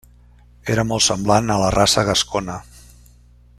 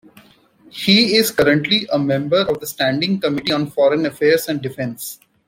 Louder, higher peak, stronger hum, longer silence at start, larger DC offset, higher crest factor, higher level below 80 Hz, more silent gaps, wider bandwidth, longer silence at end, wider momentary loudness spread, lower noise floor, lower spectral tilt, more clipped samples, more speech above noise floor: about the same, -17 LUFS vs -17 LUFS; about the same, -2 dBFS vs 0 dBFS; first, 60 Hz at -40 dBFS vs none; about the same, 0.65 s vs 0.75 s; neither; about the same, 18 dB vs 18 dB; first, -40 dBFS vs -56 dBFS; neither; about the same, 15 kHz vs 16.5 kHz; first, 0.95 s vs 0.3 s; first, 15 LU vs 12 LU; about the same, -49 dBFS vs -50 dBFS; about the same, -3.5 dB/octave vs -4.5 dB/octave; neither; about the same, 31 dB vs 33 dB